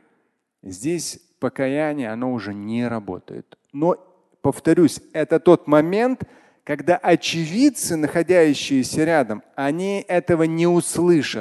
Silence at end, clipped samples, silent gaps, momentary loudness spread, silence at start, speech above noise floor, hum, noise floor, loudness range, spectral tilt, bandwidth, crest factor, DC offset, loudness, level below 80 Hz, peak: 0 s; under 0.1%; none; 13 LU; 0.65 s; 49 dB; none; -69 dBFS; 7 LU; -5.5 dB/octave; 12.5 kHz; 20 dB; under 0.1%; -20 LUFS; -56 dBFS; 0 dBFS